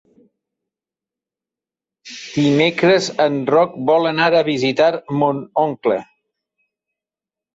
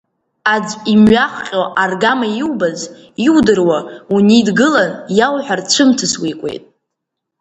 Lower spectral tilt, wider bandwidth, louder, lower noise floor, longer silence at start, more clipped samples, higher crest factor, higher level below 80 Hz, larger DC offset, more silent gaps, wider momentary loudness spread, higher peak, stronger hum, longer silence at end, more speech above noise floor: first, -5.5 dB/octave vs -4 dB/octave; about the same, 8 kHz vs 8.8 kHz; second, -17 LUFS vs -13 LUFS; first, -89 dBFS vs -77 dBFS; first, 2.05 s vs 0.45 s; neither; about the same, 16 dB vs 14 dB; second, -62 dBFS vs -48 dBFS; neither; neither; second, 6 LU vs 9 LU; about the same, -2 dBFS vs 0 dBFS; neither; first, 1.5 s vs 0.8 s; first, 73 dB vs 64 dB